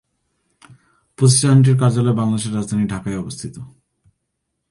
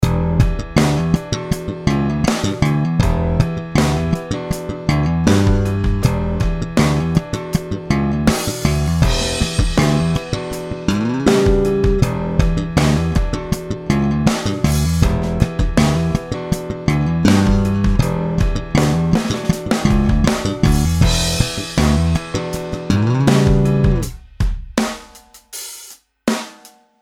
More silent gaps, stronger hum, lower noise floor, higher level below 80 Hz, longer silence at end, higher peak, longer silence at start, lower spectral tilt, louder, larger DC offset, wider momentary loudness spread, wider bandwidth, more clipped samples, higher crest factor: neither; neither; first, -75 dBFS vs -45 dBFS; second, -50 dBFS vs -24 dBFS; first, 1.05 s vs 0.35 s; about the same, -2 dBFS vs 0 dBFS; first, 1.2 s vs 0 s; about the same, -6 dB/octave vs -6 dB/octave; about the same, -16 LUFS vs -17 LUFS; neither; first, 18 LU vs 9 LU; second, 11.5 kHz vs 16.5 kHz; neither; about the same, 16 dB vs 16 dB